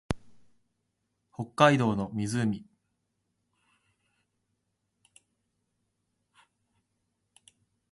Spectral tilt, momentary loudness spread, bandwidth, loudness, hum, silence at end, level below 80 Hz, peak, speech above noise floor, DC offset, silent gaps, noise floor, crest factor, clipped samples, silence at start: -6 dB/octave; 18 LU; 11.5 kHz; -27 LUFS; none; 5.3 s; -58 dBFS; -6 dBFS; 53 dB; under 0.1%; none; -80 dBFS; 28 dB; under 0.1%; 0.1 s